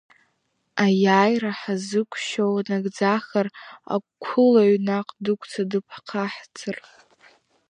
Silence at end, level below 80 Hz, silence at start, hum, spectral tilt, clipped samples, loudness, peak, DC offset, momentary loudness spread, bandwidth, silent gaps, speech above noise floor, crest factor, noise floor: 0.9 s; -76 dBFS; 0.75 s; none; -6 dB/octave; under 0.1%; -23 LUFS; -4 dBFS; under 0.1%; 14 LU; 10 kHz; none; 49 dB; 20 dB; -72 dBFS